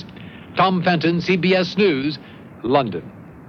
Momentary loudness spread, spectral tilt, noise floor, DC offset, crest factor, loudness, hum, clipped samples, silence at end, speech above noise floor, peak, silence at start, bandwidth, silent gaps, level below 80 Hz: 17 LU; -7 dB/octave; -38 dBFS; under 0.1%; 18 dB; -19 LUFS; none; under 0.1%; 0 s; 19 dB; -2 dBFS; 0 s; 6.8 kHz; none; -56 dBFS